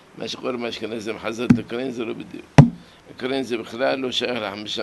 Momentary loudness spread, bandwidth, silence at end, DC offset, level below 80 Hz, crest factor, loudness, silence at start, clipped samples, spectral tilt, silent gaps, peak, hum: 15 LU; 12 kHz; 0 s; under 0.1%; -44 dBFS; 22 dB; -22 LUFS; 0.15 s; under 0.1%; -6.5 dB/octave; none; 0 dBFS; none